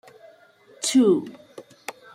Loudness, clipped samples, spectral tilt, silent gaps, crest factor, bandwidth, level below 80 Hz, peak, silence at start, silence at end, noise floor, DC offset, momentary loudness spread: -21 LUFS; under 0.1%; -4 dB/octave; none; 18 dB; 15 kHz; -72 dBFS; -8 dBFS; 0.8 s; 0.25 s; -53 dBFS; under 0.1%; 22 LU